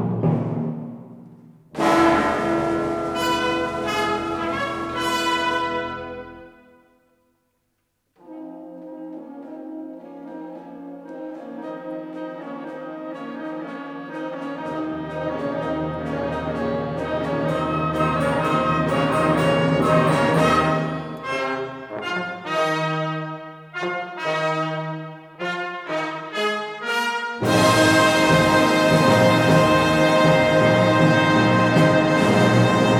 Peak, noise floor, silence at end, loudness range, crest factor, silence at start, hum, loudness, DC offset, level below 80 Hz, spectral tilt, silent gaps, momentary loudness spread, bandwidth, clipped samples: -4 dBFS; -72 dBFS; 0 s; 20 LU; 16 dB; 0 s; none; -20 LUFS; under 0.1%; -48 dBFS; -5.5 dB/octave; none; 20 LU; 16 kHz; under 0.1%